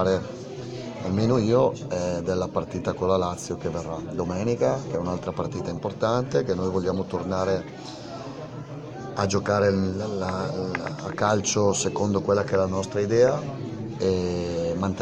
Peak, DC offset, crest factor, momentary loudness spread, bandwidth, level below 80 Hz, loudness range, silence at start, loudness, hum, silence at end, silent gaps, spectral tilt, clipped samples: -8 dBFS; under 0.1%; 18 dB; 13 LU; 10.5 kHz; -52 dBFS; 4 LU; 0 s; -25 LUFS; none; 0 s; none; -5.5 dB/octave; under 0.1%